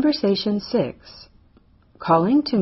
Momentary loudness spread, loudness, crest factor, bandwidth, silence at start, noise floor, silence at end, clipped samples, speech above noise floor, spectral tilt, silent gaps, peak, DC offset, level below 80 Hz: 14 LU; -21 LUFS; 16 dB; 6 kHz; 0 s; -55 dBFS; 0 s; under 0.1%; 35 dB; -5 dB/octave; none; -4 dBFS; under 0.1%; -56 dBFS